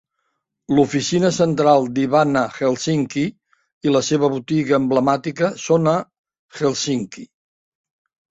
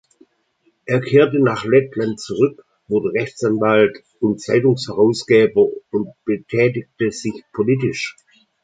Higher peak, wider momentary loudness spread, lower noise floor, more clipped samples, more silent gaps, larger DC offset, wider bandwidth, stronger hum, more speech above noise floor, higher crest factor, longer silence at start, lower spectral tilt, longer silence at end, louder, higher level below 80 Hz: about the same, -2 dBFS vs -2 dBFS; second, 7 LU vs 10 LU; first, -74 dBFS vs -63 dBFS; neither; first, 3.73-3.81 s, 6.19-6.24 s, 6.39-6.49 s vs none; neither; second, 8 kHz vs 9.2 kHz; neither; first, 56 dB vs 46 dB; about the same, 18 dB vs 16 dB; second, 0.7 s vs 0.85 s; about the same, -5.5 dB/octave vs -6.5 dB/octave; first, 1.05 s vs 0.5 s; about the same, -19 LUFS vs -18 LUFS; about the same, -58 dBFS vs -58 dBFS